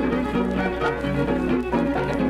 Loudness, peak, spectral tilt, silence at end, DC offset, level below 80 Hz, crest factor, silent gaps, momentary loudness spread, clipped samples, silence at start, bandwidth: -23 LUFS; -10 dBFS; -7.5 dB/octave; 0 s; under 0.1%; -36 dBFS; 12 dB; none; 2 LU; under 0.1%; 0 s; 12.5 kHz